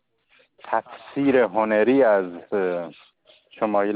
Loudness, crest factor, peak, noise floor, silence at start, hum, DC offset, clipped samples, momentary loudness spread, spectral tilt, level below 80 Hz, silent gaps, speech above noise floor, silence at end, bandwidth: -22 LUFS; 16 dB; -6 dBFS; -61 dBFS; 0.65 s; none; under 0.1%; under 0.1%; 11 LU; -10.5 dB/octave; -66 dBFS; none; 40 dB; 0 s; 4.8 kHz